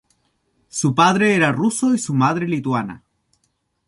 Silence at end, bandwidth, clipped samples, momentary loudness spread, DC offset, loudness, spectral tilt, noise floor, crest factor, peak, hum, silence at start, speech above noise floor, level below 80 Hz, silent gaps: 0.9 s; 11.5 kHz; under 0.1%; 9 LU; under 0.1%; -18 LUFS; -5 dB/octave; -69 dBFS; 18 dB; -2 dBFS; none; 0.75 s; 51 dB; -60 dBFS; none